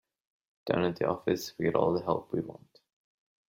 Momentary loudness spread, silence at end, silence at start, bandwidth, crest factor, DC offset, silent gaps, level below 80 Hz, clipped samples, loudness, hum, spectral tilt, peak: 8 LU; 0.95 s; 0.65 s; 16.5 kHz; 22 dB; under 0.1%; none; -64 dBFS; under 0.1%; -31 LUFS; none; -6.5 dB/octave; -10 dBFS